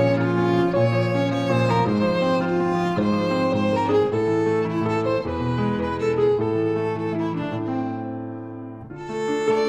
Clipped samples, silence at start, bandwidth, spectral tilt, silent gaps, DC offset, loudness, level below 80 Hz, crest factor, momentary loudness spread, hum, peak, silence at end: under 0.1%; 0 s; 10 kHz; -7.5 dB/octave; none; under 0.1%; -22 LUFS; -50 dBFS; 14 dB; 10 LU; none; -8 dBFS; 0 s